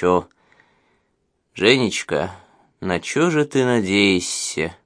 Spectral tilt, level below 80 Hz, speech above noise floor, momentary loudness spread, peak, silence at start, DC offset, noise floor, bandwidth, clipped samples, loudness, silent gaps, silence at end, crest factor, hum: -4 dB/octave; -54 dBFS; 50 dB; 9 LU; 0 dBFS; 0 s; under 0.1%; -69 dBFS; 10.5 kHz; under 0.1%; -19 LUFS; none; 0.1 s; 20 dB; none